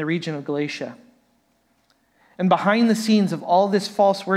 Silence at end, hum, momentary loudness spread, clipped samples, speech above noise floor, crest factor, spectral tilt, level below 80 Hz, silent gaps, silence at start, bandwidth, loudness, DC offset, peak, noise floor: 0 s; none; 9 LU; under 0.1%; 45 dB; 18 dB; -6 dB/octave; -76 dBFS; none; 0 s; 14.5 kHz; -20 LUFS; under 0.1%; -4 dBFS; -65 dBFS